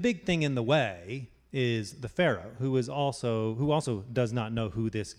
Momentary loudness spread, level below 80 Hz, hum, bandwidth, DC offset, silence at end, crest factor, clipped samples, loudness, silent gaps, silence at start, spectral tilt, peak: 7 LU; -56 dBFS; none; 11.5 kHz; under 0.1%; 0.05 s; 18 dB; under 0.1%; -30 LUFS; none; 0 s; -6 dB/octave; -12 dBFS